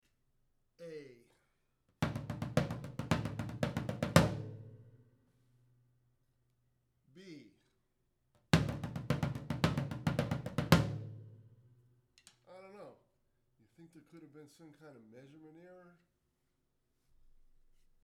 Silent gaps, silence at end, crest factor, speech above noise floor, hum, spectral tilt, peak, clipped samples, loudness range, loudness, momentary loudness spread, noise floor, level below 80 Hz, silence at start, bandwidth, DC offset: none; 2.15 s; 32 dB; 23 dB; none; -6 dB/octave; -8 dBFS; under 0.1%; 24 LU; -35 LUFS; 27 LU; -80 dBFS; -56 dBFS; 0.8 s; 16 kHz; under 0.1%